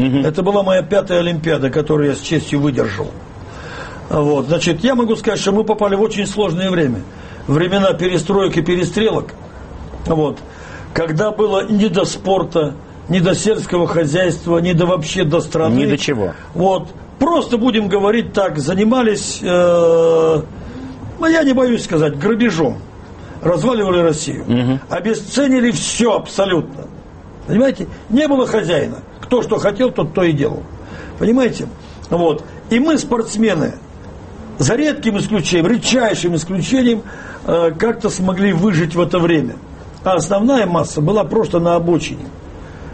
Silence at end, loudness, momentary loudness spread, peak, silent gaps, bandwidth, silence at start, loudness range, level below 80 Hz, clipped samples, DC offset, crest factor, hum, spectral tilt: 0 s; -16 LUFS; 17 LU; -2 dBFS; none; 8.8 kHz; 0 s; 3 LU; -40 dBFS; under 0.1%; under 0.1%; 14 dB; none; -5.5 dB/octave